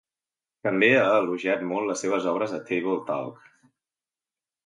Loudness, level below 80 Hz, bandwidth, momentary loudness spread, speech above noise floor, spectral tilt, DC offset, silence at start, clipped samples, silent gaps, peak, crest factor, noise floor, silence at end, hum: -24 LUFS; -78 dBFS; 11.5 kHz; 12 LU; over 66 dB; -4.5 dB/octave; under 0.1%; 0.65 s; under 0.1%; none; -6 dBFS; 20 dB; under -90 dBFS; 1.35 s; none